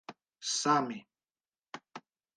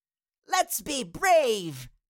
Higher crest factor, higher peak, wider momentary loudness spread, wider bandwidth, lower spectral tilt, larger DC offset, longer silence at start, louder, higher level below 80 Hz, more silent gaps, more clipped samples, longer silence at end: first, 24 dB vs 16 dB; about the same, -14 dBFS vs -12 dBFS; first, 24 LU vs 13 LU; second, 10 kHz vs 17 kHz; about the same, -2.5 dB/octave vs -2.5 dB/octave; neither; second, 0.1 s vs 0.5 s; second, -31 LUFS vs -26 LUFS; second, -88 dBFS vs -58 dBFS; neither; neither; first, 0.35 s vs 0.2 s